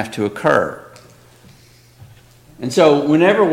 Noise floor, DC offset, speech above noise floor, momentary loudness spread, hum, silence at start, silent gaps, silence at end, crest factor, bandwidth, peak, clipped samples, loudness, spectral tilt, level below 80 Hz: -47 dBFS; under 0.1%; 33 dB; 14 LU; none; 0 s; none; 0 s; 16 dB; 16 kHz; 0 dBFS; under 0.1%; -15 LUFS; -6 dB/octave; -56 dBFS